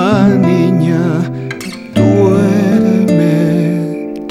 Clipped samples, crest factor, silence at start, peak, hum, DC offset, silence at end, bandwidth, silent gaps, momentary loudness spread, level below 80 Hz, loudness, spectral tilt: under 0.1%; 10 dB; 0 s; 0 dBFS; none; under 0.1%; 0 s; 14 kHz; none; 10 LU; -44 dBFS; -12 LUFS; -8 dB/octave